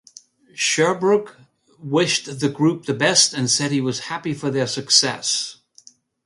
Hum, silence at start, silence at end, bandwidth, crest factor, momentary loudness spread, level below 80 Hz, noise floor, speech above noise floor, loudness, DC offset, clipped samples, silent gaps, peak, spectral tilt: none; 0.55 s; 0.7 s; 11.5 kHz; 20 dB; 11 LU; -66 dBFS; -51 dBFS; 31 dB; -19 LUFS; under 0.1%; under 0.1%; none; -2 dBFS; -3 dB/octave